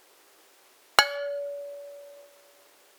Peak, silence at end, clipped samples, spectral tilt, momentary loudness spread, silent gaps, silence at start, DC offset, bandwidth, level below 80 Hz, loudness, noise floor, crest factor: 0 dBFS; 0.7 s; under 0.1%; 1 dB/octave; 24 LU; none; 1 s; under 0.1%; over 20 kHz; -68 dBFS; -26 LUFS; -59 dBFS; 32 dB